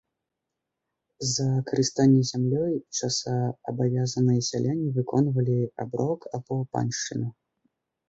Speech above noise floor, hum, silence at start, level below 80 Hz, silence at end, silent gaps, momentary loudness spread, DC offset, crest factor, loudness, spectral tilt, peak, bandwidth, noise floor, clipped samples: 59 dB; none; 1.2 s; -62 dBFS; 0.75 s; none; 9 LU; under 0.1%; 16 dB; -26 LUFS; -5.5 dB/octave; -10 dBFS; 8 kHz; -84 dBFS; under 0.1%